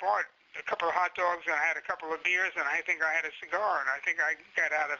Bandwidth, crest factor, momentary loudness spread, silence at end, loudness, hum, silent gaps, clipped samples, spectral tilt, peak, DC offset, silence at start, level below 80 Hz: 7.4 kHz; 18 dB; 6 LU; 0 s; -29 LUFS; none; none; under 0.1%; 1.5 dB/octave; -12 dBFS; under 0.1%; 0 s; -74 dBFS